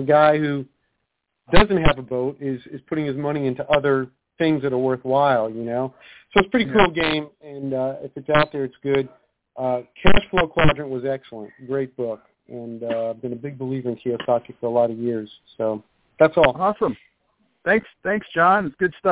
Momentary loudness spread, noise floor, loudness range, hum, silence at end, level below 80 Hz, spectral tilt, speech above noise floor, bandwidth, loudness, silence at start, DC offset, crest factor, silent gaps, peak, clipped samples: 14 LU; -76 dBFS; 5 LU; none; 0 s; -38 dBFS; -10 dB/octave; 56 dB; 4 kHz; -22 LUFS; 0 s; under 0.1%; 20 dB; none; 0 dBFS; under 0.1%